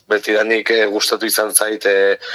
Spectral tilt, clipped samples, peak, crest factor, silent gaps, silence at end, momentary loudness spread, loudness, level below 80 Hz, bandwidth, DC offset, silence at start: -0.5 dB/octave; under 0.1%; 0 dBFS; 16 dB; none; 0 s; 3 LU; -15 LUFS; -68 dBFS; 19 kHz; under 0.1%; 0.1 s